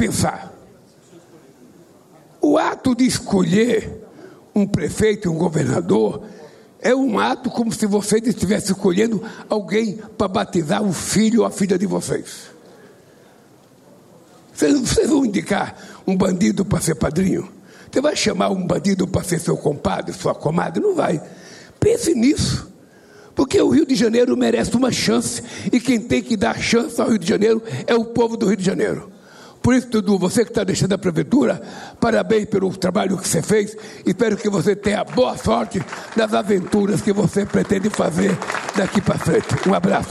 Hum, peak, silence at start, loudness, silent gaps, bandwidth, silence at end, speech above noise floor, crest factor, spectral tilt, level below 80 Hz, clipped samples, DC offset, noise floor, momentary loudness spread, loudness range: none; -6 dBFS; 0 s; -19 LUFS; none; 13.5 kHz; 0 s; 31 dB; 14 dB; -5.5 dB/octave; -46 dBFS; under 0.1%; under 0.1%; -49 dBFS; 7 LU; 3 LU